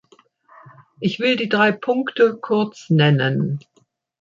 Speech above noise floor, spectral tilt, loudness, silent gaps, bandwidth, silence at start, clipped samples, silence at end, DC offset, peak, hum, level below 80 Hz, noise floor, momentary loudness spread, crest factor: 44 dB; -7 dB/octave; -19 LUFS; none; 7.4 kHz; 0.65 s; under 0.1%; 0.6 s; under 0.1%; -4 dBFS; none; -64 dBFS; -62 dBFS; 9 LU; 18 dB